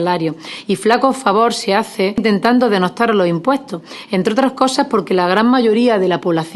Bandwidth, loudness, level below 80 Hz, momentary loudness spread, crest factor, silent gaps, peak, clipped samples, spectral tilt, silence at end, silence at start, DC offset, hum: 12.5 kHz; -15 LUFS; -56 dBFS; 8 LU; 14 dB; none; 0 dBFS; under 0.1%; -5.5 dB/octave; 0 s; 0 s; under 0.1%; none